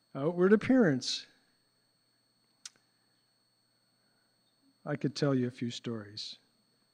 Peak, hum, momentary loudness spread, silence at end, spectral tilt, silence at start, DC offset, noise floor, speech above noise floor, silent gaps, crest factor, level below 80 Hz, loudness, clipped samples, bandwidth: -12 dBFS; none; 25 LU; 0.6 s; -5.5 dB/octave; 0.15 s; under 0.1%; -74 dBFS; 44 dB; none; 24 dB; -72 dBFS; -31 LUFS; under 0.1%; 10 kHz